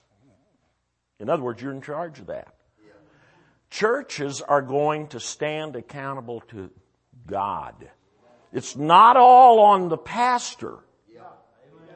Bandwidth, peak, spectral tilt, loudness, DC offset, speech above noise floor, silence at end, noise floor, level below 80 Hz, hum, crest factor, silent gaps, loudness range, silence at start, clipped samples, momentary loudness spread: 8.8 kHz; -2 dBFS; -4.5 dB/octave; -18 LUFS; under 0.1%; 54 dB; 0.65 s; -74 dBFS; -66 dBFS; none; 20 dB; none; 17 LU; 1.2 s; under 0.1%; 26 LU